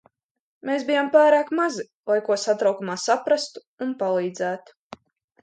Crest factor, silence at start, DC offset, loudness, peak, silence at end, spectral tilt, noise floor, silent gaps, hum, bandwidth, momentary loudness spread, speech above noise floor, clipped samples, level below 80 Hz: 18 dB; 0.65 s; under 0.1%; -22 LUFS; -6 dBFS; 0.85 s; -4 dB/octave; -47 dBFS; 1.94-2.03 s, 3.67-3.77 s; none; 9.2 kHz; 14 LU; 24 dB; under 0.1%; -76 dBFS